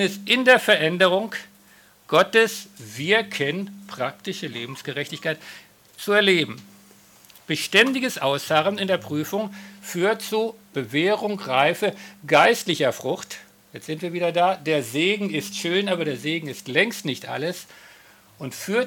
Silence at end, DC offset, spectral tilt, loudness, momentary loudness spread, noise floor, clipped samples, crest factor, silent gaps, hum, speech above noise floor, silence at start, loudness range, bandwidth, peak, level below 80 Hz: 0 s; under 0.1%; -4 dB/octave; -22 LUFS; 16 LU; -54 dBFS; under 0.1%; 20 dB; none; none; 31 dB; 0 s; 4 LU; 18 kHz; -4 dBFS; -72 dBFS